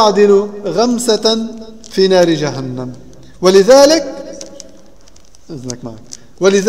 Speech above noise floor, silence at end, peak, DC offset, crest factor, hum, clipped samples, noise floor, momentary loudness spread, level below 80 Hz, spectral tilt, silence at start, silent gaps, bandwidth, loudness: 34 dB; 0 s; 0 dBFS; 1%; 14 dB; none; under 0.1%; -45 dBFS; 23 LU; -48 dBFS; -4.5 dB/octave; 0 s; none; 15.5 kHz; -11 LUFS